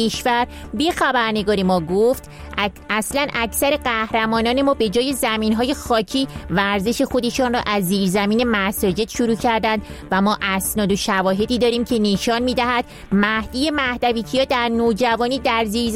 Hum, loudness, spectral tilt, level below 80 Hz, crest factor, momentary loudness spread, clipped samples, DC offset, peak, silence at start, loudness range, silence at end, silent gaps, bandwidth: none; -19 LUFS; -4.5 dB/octave; -40 dBFS; 16 dB; 4 LU; under 0.1%; under 0.1%; -4 dBFS; 0 s; 1 LU; 0 s; none; 16.5 kHz